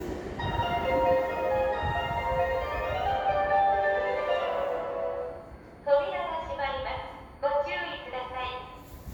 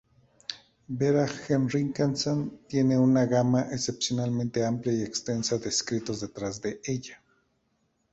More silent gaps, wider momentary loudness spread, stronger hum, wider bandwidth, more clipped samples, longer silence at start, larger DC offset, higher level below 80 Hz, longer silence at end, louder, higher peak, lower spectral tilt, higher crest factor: neither; about the same, 12 LU vs 12 LU; neither; first, over 20 kHz vs 8.2 kHz; neither; second, 0 s vs 0.5 s; neither; first, -46 dBFS vs -60 dBFS; second, 0 s vs 1 s; about the same, -29 LUFS vs -27 LUFS; about the same, -12 dBFS vs -12 dBFS; about the same, -6 dB/octave vs -5.5 dB/octave; about the same, 16 dB vs 16 dB